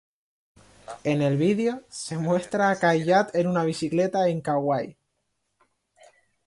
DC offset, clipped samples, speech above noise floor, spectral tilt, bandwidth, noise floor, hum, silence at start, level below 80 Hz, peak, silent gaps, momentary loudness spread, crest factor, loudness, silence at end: under 0.1%; under 0.1%; 52 dB; -6 dB/octave; 11.5 kHz; -76 dBFS; none; 0.9 s; -66 dBFS; -8 dBFS; none; 10 LU; 18 dB; -24 LUFS; 1.55 s